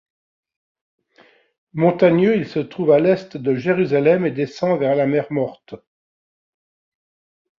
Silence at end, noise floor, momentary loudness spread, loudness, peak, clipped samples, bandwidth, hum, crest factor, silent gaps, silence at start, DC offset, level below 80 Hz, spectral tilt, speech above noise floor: 1.8 s; -54 dBFS; 9 LU; -18 LUFS; -2 dBFS; under 0.1%; 7.2 kHz; none; 18 dB; none; 1.75 s; under 0.1%; -62 dBFS; -8.5 dB/octave; 37 dB